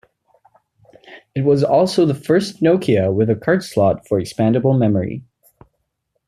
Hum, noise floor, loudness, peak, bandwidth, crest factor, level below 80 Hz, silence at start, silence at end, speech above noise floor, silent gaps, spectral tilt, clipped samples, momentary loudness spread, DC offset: none; -72 dBFS; -17 LUFS; -4 dBFS; 14 kHz; 14 dB; -56 dBFS; 1.1 s; 1.05 s; 56 dB; none; -7.5 dB/octave; under 0.1%; 7 LU; under 0.1%